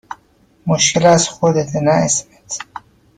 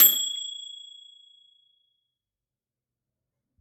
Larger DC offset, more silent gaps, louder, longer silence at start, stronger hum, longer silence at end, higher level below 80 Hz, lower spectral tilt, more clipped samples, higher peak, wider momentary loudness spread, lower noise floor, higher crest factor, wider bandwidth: neither; neither; first, -14 LUFS vs -24 LUFS; about the same, 0.1 s vs 0 s; neither; second, 0.55 s vs 2.8 s; first, -52 dBFS vs under -90 dBFS; first, -4 dB/octave vs 2.5 dB/octave; neither; about the same, -2 dBFS vs -4 dBFS; about the same, 22 LU vs 24 LU; second, -54 dBFS vs under -90 dBFS; second, 16 dB vs 26 dB; second, 10 kHz vs 16 kHz